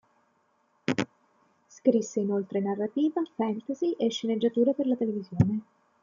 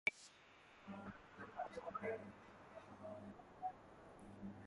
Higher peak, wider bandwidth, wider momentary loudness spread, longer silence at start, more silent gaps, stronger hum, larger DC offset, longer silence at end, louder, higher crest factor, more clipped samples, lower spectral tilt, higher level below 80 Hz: first, -8 dBFS vs -24 dBFS; second, 7.6 kHz vs 11 kHz; second, 6 LU vs 14 LU; first, 0.9 s vs 0.05 s; neither; neither; neither; first, 0.4 s vs 0 s; first, -28 LUFS vs -52 LUFS; second, 20 dB vs 28 dB; neither; first, -6.5 dB/octave vs -5 dB/octave; first, -64 dBFS vs -76 dBFS